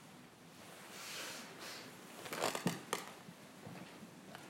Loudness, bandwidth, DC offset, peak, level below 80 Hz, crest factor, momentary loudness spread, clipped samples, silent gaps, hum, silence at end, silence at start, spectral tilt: -45 LUFS; 16 kHz; under 0.1%; -18 dBFS; -84 dBFS; 30 dB; 16 LU; under 0.1%; none; none; 0 s; 0 s; -3 dB/octave